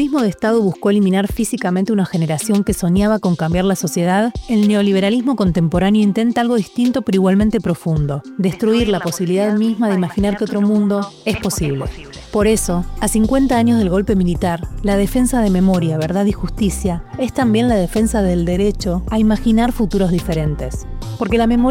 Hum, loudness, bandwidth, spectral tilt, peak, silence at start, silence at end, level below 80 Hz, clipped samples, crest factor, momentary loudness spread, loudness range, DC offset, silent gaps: none; -16 LUFS; 16.5 kHz; -6 dB/octave; -2 dBFS; 0 s; 0 s; -30 dBFS; under 0.1%; 14 dB; 6 LU; 2 LU; under 0.1%; none